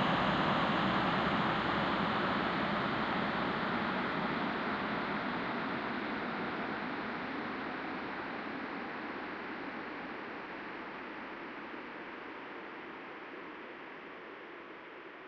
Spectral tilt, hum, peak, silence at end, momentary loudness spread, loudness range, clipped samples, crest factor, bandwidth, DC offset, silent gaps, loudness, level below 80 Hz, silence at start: -6.5 dB/octave; none; -18 dBFS; 0 s; 15 LU; 12 LU; under 0.1%; 18 dB; 8.2 kHz; under 0.1%; none; -36 LUFS; -62 dBFS; 0 s